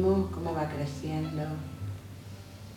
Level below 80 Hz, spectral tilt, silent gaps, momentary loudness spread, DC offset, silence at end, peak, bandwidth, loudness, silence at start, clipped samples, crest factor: -52 dBFS; -7.5 dB/octave; none; 16 LU; under 0.1%; 0 s; -16 dBFS; 17.5 kHz; -33 LUFS; 0 s; under 0.1%; 16 dB